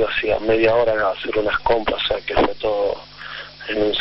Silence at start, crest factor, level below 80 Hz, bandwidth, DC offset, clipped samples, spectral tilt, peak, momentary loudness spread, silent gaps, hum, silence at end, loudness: 0 s; 16 dB; -40 dBFS; 6 kHz; under 0.1%; under 0.1%; -7 dB/octave; -4 dBFS; 14 LU; none; none; 0 s; -20 LUFS